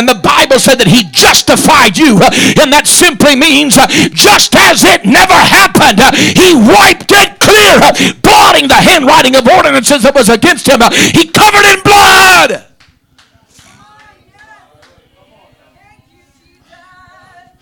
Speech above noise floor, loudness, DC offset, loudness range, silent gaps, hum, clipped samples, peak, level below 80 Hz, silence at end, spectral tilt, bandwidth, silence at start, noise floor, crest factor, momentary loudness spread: 45 dB; -4 LUFS; under 0.1%; 3 LU; none; none; 0.4%; 0 dBFS; -32 dBFS; 5.05 s; -2.5 dB/octave; over 20 kHz; 0 s; -50 dBFS; 6 dB; 3 LU